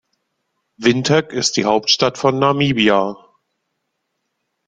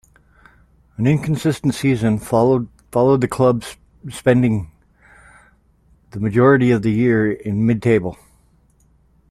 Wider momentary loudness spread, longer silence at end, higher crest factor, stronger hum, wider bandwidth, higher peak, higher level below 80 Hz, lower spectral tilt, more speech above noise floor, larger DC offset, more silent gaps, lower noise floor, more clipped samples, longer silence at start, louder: second, 4 LU vs 14 LU; first, 1.55 s vs 1.15 s; about the same, 18 dB vs 16 dB; neither; second, 9.6 kHz vs 14 kHz; about the same, -2 dBFS vs -2 dBFS; second, -56 dBFS vs -48 dBFS; second, -4 dB/octave vs -7.5 dB/octave; first, 58 dB vs 40 dB; neither; neither; first, -73 dBFS vs -56 dBFS; neither; second, 0.8 s vs 1 s; about the same, -16 LUFS vs -17 LUFS